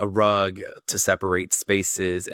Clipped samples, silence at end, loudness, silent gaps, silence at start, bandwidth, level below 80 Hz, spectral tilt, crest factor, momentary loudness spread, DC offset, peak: under 0.1%; 0 s; -22 LUFS; none; 0 s; 18 kHz; -60 dBFS; -3 dB/octave; 18 dB; 7 LU; under 0.1%; -6 dBFS